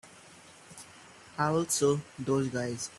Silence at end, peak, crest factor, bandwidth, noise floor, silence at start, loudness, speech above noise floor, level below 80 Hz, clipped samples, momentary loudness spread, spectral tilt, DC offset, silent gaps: 0 s; -14 dBFS; 18 dB; 13.5 kHz; -54 dBFS; 0.05 s; -30 LUFS; 24 dB; -68 dBFS; under 0.1%; 24 LU; -4.5 dB/octave; under 0.1%; none